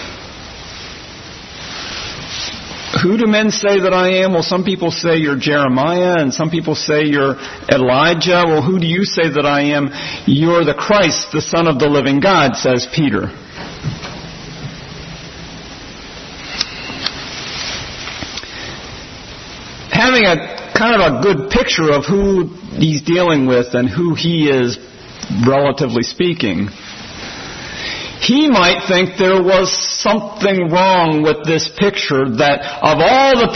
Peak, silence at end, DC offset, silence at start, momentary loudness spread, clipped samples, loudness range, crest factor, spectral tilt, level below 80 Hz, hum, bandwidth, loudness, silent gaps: 0 dBFS; 0 s; under 0.1%; 0 s; 19 LU; under 0.1%; 10 LU; 14 dB; -5 dB/octave; -40 dBFS; none; 6.4 kHz; -14 LUFS; none